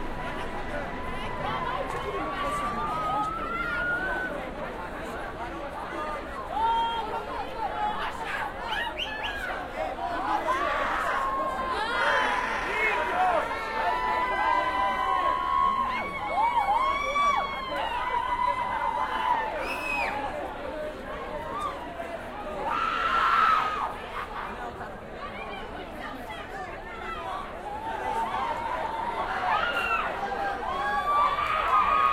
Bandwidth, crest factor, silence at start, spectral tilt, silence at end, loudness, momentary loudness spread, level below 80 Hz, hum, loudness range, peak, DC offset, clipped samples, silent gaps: 16 kHz; 18 dB; 0 s; -4 dB/octave; 0 s; -28 LUFS; 12 LU; -46 dBFS; none; 7 LU; -10 dBFS; under 0.1%; under 0.1%; none